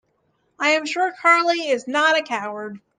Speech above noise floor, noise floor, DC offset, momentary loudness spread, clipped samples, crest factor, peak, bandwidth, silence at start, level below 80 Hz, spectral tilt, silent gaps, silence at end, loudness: 47 dB; -67 dBFS; under 0.1%; 11 LU; under 0.1%; 18 dB; -4 dBFS; 9.8 kHz; 0.6 s; -78 dBFS; -2 dB/octave; none; 0.2 s; -19 LUFS